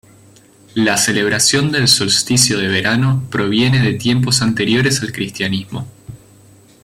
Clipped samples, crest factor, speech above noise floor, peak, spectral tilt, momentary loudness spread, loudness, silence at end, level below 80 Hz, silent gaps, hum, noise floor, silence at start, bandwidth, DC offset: under 0.1%; 16 dB; 31 dB; 0 dBFS; -3.5 dB/octave; 10 LU; -14 LUFS; 0.7 s; -48 dBFS; none; none; -46 dBFS; 0.75 s; 16.5 kHz; under 0.1%